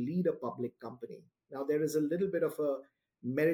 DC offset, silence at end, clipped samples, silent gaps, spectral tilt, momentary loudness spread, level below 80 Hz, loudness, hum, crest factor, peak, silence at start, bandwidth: under 0.1%; 0 s; under 0.1%; none; -7 dB/octave; 15 LU; -78 dBFS; -34 LUFS; none; 16 dB; -18 dBFS; 0 s; 17.5 kHz